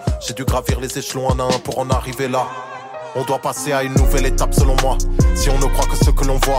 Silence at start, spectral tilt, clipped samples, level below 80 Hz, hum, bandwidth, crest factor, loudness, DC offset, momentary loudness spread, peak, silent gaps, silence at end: 0 s; -5 dB/octave; under 0.1%; -18 dBFS; none; 16.5 kHz; 12 dB; -19 LUFS; under 0.1%; 7 LU; -4 dBFS; none; 0 s